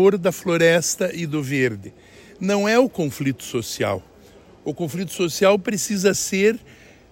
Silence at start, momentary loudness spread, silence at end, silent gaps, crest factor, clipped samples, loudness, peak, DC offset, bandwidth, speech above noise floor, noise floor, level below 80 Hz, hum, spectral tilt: 0 s; 11 LU; 0.55 s; none; 18 dB; under 0.1%; -21 LUFS; -4 dBFS; under 0.1%; 16.5 kHz; 27 dB; -48 dBFS; -56 dBFS; none; -4.5 dB/octave